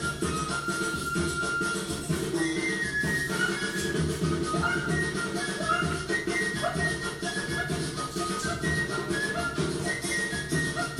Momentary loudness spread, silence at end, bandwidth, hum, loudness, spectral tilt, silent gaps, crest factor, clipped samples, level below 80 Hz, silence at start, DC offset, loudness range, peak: 3 LU; 0 s; 16 kHz; none; -28 LUFS; -4 dB/octave; none; 14 dB; under 0.1%; -48 dBFS; 0 s; under 0.1%; 1 LU; -14 dBFS